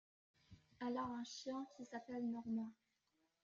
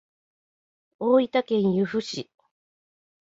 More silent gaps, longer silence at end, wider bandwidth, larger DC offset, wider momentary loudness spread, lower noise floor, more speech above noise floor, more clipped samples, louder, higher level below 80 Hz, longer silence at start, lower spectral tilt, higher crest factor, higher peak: neither; second, 0.7 s vs 1.05 s; about the same, 7.4 kHz vs 7.8 kHz; neither; second, 7 LU vs 14 LU; second, -85 dBFS vs under -90 dBFS; second, 39 dB vs over 67 dB; neither; second, -47 LUFS vs -24 LUFS; second, -82 dBFS vs -68 dBFS; second, 0.5 s vs 1 s; second, -5 dB/octave vs -6.5 dB/octave; about the same, 16 dB vs 18 dB; second, -32 dBFS vs -8 dBFS